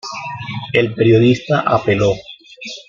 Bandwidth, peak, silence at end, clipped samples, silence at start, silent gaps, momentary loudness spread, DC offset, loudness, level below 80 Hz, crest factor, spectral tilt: 7.4 kHz; 0 dBFS; 0.05 s; under 0.1%; 0.05 s; none; 14 LU; under 0.1%; -15 LUFS; -48 dBFS; 16 dB; -6.5 dB/octave